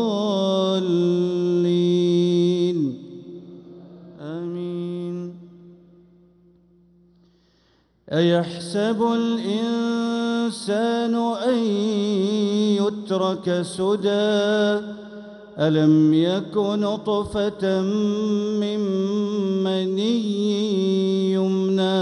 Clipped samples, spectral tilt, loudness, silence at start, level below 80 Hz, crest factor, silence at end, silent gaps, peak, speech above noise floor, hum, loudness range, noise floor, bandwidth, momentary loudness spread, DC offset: under 0.1%; -6.5 dB/octave; -22 LUFS; 0 s; -60 dBFS; 14 dB; 0 s; none; -8 dBFS; 41 dB; none; 13 LU; -62 dBFS; 11 kHz; 10 LU; under 0.1%